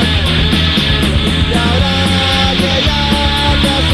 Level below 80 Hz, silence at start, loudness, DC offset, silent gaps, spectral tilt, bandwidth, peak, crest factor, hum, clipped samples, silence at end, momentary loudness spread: -20 dBFS; 0 s; -11 LUFS; under 0.1%; none; -5 dB/octave; 13.5 kHz; 0 dBFS; 12 dB; none; under 0.1%; 0 s; 1 LU